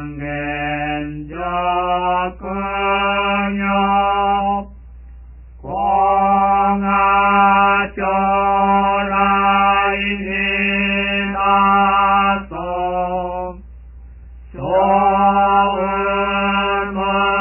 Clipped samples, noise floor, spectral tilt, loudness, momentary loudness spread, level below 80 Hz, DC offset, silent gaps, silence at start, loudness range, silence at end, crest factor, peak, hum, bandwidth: under 0.1%; -37 dBFS; -9 dB/octave; -16 LUFS; 10 LU; -38 dBFS; under 0.1%; none; 0 s; 5 LU; 0 s; 14 dB; -2 dBFS; none; 3.1 kHz